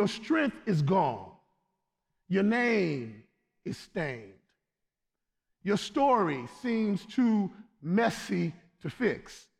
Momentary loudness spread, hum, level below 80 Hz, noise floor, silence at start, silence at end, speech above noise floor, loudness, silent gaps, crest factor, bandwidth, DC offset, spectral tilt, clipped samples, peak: 15 LU; none; -66 dBFS; -86 dBFS; 0 s; 0.2 s; 57 dB; -29 LUFS; none; 16 dB; 13.5 kHz; under 0.1%; -6.5 dB/octave; under 0.1%; -14 dBFS